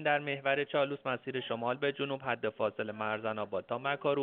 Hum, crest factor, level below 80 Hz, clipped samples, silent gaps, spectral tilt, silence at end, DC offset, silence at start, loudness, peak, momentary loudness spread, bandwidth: none; 20 dB; -78 dBFS; under 0.1%; none; -3 dB/octave; 0 s; under 0.1%; 0 s; -34 LUFS; -14 dBFS; 6 LU; 4.5 kHz